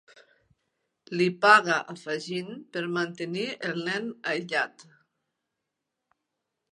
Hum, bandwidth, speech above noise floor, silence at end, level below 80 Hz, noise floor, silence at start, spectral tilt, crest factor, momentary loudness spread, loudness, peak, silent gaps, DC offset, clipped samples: none; 11 kHz; 57 dB; 1.9 s; -82 dBFS; -84 dBFS; 1.1 s; -4.5 dB/octave; 26 dB; 15 LU; -26 LUFS; -4 dBFS; none; under 0.1%; under 0.1%